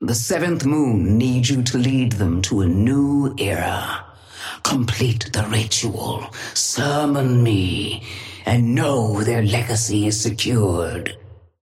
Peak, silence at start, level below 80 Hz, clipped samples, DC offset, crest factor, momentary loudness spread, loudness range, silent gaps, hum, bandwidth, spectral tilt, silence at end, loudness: -4 dBFS; 0 s; -46 dBFS; under 0.1%; under 0.1%; 16 dB; 9 LU; 3 LU; none; none; 15.5 kHz; -5 dB/octave; 0.3 s; -20 LUFS